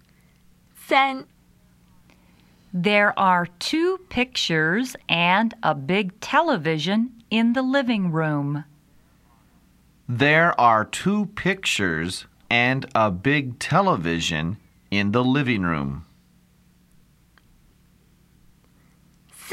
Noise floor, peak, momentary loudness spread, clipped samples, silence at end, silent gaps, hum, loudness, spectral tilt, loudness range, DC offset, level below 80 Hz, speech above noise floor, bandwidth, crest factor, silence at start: -58 dBFS; -2 dBFS; 10 LU; under 0.1%; 0 s; none; none; -21 LUFS; -5 dB/octave; 5 LU; under 0.1%; -54 dBFS; 36 dB; 15 kHz; 20 dB; 0.8 s